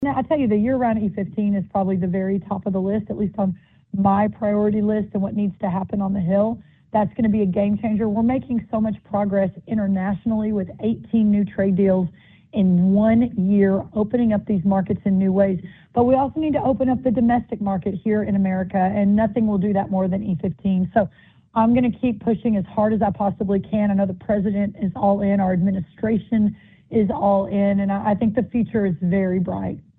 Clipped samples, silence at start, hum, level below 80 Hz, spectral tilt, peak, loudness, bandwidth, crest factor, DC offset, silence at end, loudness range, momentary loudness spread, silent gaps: under 0.1%; 0 s; none; -48 dBFS; -12.5 dB/octave; -4 dBFS; -21 LUFS; 3.8 kHz; 16 dB; under 0.1%; 0.2 s; 3 LU; 6 LU; none